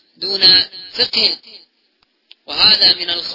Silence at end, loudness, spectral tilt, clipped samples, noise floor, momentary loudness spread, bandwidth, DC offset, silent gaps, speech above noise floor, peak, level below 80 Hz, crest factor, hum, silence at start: 0 s; -11 LUFS; -2.5 dB/octave; under 0.1%; -62 dBFS; 14 LU; 6 kHz; under 0.1%; none; 47 dB; 0 dBFS; -52 dBFS; 16 dB; none; 0.2 s